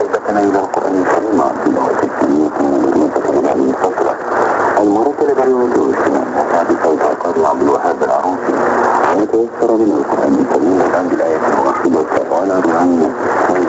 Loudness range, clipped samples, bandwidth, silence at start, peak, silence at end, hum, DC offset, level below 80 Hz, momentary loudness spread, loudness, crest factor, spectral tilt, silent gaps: 1 LU; under 0.1%; 8.2 kHz; 0 s; 0 dBFS; 0 s; none; under 0.1%; -52 dBFS; 3 LU; -13 LUFS; 12 dB; -6.5 dB/octave; none